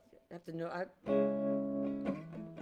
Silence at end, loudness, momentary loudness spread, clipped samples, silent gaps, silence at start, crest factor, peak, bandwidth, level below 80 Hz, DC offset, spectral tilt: 0 s; -37 LUFS; 15 LU; under 0.1%; none; 0.15 s; 16 dB; -20 dBFS; 7.4 kHz; -72 dBFS; under 0.1%; -9 dB/octave